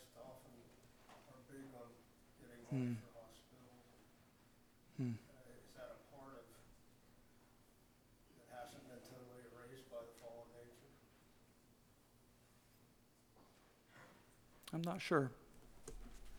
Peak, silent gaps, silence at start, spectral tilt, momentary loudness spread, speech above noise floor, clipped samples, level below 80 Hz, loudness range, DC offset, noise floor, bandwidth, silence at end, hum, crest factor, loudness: -22 dBFS; none; 0 s; -6 dB/octave; 24 LU; 30 dB; under 0.1%; -70 dBFS; 18 LU; under 0.1%; -71 dBFS; over 20 kHz; 0 s; none; 30 dB; -49 LUFS